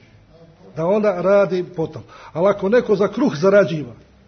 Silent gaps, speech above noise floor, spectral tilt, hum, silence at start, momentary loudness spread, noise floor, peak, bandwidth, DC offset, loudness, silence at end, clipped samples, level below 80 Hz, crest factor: none; 30 dB; -7.5 dB/octave; none; 0.75 s; 15 LU; -47 dBFS; -2 dBFS; 6.6 kHz; under 0.1%; -18 LUFS; 0.35 s; under 0.1%; -56 dBFS; 16 dB